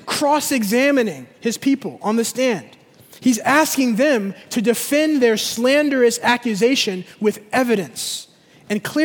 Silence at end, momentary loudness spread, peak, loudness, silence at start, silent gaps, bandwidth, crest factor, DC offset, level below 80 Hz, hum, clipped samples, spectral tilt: 0 s; 9 LU; 0 dBFS; -18 LUFS; 0.05 s; none; over 20 kHz; 18 dB; under 0.1%; -66 dBFS; none; under 0.1%; -3.5 dB/octave